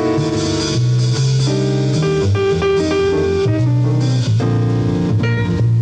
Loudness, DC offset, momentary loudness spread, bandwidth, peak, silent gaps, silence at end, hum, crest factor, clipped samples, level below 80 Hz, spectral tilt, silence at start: -16 LUFS; under 0.1%; 2 LU; 9.2 kHz; -6 dBFS; none; 0 s; none; 8 dB; under 0.1%; -38 dBFS; -6.5 dB/octave; 0 s